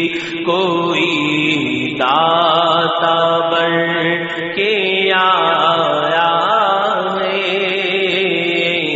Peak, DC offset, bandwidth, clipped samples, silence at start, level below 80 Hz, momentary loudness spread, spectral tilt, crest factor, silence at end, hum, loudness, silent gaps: 0 dBFS; under 0.1%; 8 kHz; under 0.1%; 0 s; -60 dBFS; 5 LU; -1.5 dB/octave; 14 dB; 0 s; none; -14 LUFS; none